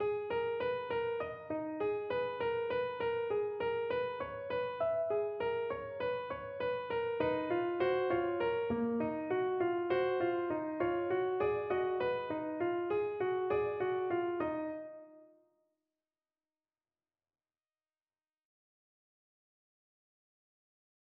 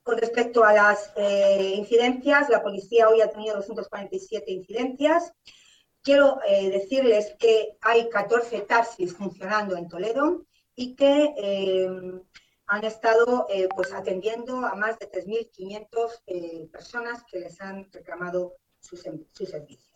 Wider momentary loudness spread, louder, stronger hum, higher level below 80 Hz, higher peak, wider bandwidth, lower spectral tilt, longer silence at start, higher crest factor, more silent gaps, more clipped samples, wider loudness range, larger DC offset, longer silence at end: second, 6 LU vs 18 LU; second, -35 LUFS vs -23 LUFS; neither; about the same, -68 dBFS vs -66 dBFS; second, -20 dBFS vs -8 dBFS; second, 5.2 kHz vs 9 kHz; about the same, -4.5 dB/octave vs -4.5 dB/octave; about the same, 0 s vs 0.05 s; about the same, 16 dB vs 16 dB; neither; neither; second, 4 LU vs 12 LU; neither; first, 5.9 s vs 0.3 s